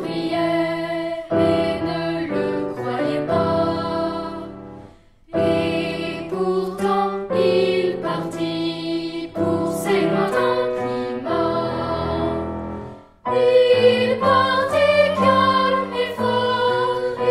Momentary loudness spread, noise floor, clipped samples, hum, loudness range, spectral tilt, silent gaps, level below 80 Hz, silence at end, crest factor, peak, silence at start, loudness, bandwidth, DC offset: 10 LU; -46 dBFS; under 0.1%; none; 7 LU; -6 dB/octave; none; -48 dBFS; 0 s; 16 dB; -4 dBFS; 0 s; -20 LUFS; 14 kHz; under 0.1%